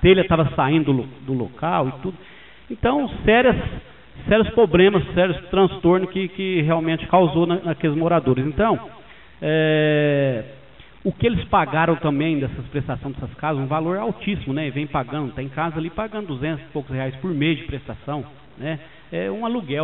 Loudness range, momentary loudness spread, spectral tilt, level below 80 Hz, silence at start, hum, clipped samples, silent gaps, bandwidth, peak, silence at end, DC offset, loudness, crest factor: 8 LU; 13 LU; -5.5 dB/octave; -40 dBFS; 0 s; none; under 0.1%; none; 4.1 kHz; -4 dBFS; 0 s; 0.4%; -21 LUFS; 18 dB